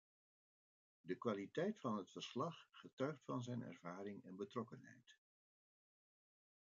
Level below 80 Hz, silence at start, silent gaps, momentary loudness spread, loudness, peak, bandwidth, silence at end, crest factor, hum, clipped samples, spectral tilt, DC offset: under -90 dBFS; 1.05 s; 2.93-2.97 s; 17 LU; -48 LUFS; -28 dBFS; 7.4 kHz; 1.65 s; 22 dB; none; under 0.1%; -5.5 dB/octave; under 0.1%